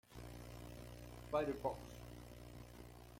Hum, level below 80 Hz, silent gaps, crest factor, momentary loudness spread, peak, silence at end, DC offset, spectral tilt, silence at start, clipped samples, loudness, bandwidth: 60 Hz at -55 dBFS; -60 dBFS; none; 22 dB; 15 LU; -24 dBFS; 0 s; under 0.1%; -6 dB/octave; 0.05 s; under 0.1%; -48 LUFS; 16.5 kHz